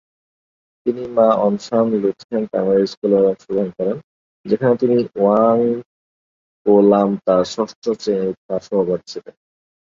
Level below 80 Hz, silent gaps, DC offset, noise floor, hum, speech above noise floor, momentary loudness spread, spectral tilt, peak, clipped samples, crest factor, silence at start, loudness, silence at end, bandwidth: -60 dBFS; 2.24-2.29 s, 2.97-3.02 s, 4.04-4.44 s, 5.86-6.65 s, 7.76-7.82 s, 8.37-8.49 s; under 0.1%; under -90 dBFS; none; over 73 dB; 10 LU; -7.5 dB/octave; -2 dBFS; under 0.1%; 16 dB; 0.85 s; -18 LUFS; 0.8 s; 7.6 kHz